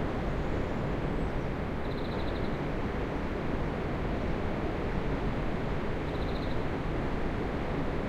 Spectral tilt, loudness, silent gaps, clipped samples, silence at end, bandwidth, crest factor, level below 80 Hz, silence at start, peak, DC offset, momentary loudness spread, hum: -8 dB/octave; -34 LUFS; none; under 0.1%; 0 s; 8.8 kHz; 14 dB; -38 dBFS; 0 s; -18 dBFS; under 0.1%; 1 LU; none